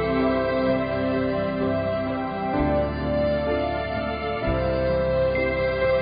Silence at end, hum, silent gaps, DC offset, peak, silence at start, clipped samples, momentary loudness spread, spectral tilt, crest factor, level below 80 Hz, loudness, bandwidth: 0 s; none; none; under 0.1%; -10 dBFS; 0 s; under 0.1%; 4 LU; -10.5 dB/octave; 12 dB; -36 dBFS; -24 LUFS; 5 kHz